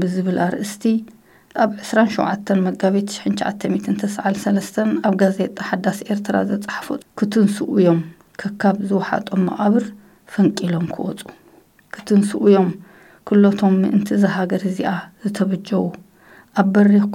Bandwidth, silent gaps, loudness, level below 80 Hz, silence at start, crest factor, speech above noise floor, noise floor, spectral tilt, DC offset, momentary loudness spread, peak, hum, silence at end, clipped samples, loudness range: 13.5 kHz; none; -19 LUFS; -62 dBFS; 0 s; 18 dB; 33 dB; -51 dBFS; -7 dB/octave; under 0.1%; 12 LU; 0 dBFS; none; 0 s; under 0.1%; 3 LU